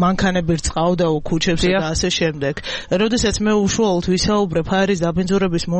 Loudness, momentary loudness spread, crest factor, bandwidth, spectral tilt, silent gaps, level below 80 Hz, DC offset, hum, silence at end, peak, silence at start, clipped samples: -18 LUFS; 3 LU; 10 dB; 8.8 kHz; -5 dB/octave; none; -34 dBFS; under 0.1%; none; 0 s; -6 dBFS; 0 s; under 0.1%